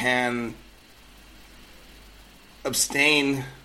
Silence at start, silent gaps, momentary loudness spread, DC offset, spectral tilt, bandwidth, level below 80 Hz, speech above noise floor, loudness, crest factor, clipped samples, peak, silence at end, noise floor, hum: 0 s; none; 15 LU; under 0.1%; -2.5 dB/octave; 16.5 kHz; -54 dBFS; 26 dB; -23 LUFS; 22 dB; under 0.1%; -6 dBFS; 0.05 s; -50 dBFS; none